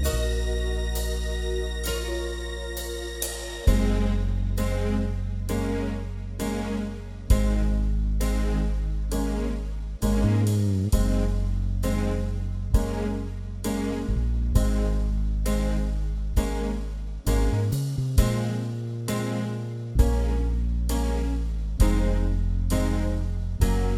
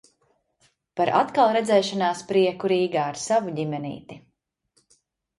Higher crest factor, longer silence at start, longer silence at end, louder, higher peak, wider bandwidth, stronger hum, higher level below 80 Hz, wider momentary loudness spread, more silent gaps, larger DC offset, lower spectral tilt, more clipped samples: about the same, 18 dB vs 18 dB; second, 0 s vs 0.95 s; second, 0 s vs 1.2 s; second, -27 LUFS vs -23 LUFS; about the same, -6 dBFS vs -6 dBFS; first, 16.5 kHz vs 11.5 kHz; neither; first, -26 dBFS vs -68 dBFS; second, 8 LU vs 12 LU; neither; neither; about the same, -6 dB/octave vs -5 dB/octave; neither